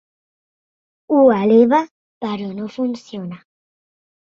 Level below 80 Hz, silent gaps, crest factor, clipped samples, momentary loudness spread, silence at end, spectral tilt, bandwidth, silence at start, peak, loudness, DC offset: -64 dBFS; 1.91-2.21 s; 18 dB; under 0.1%; 18 LU; 0.95 s; -7.5 dB/octave; 7.2 kHz; 1.1 s; -2 dBFS; -16 LUFS; under 0.1%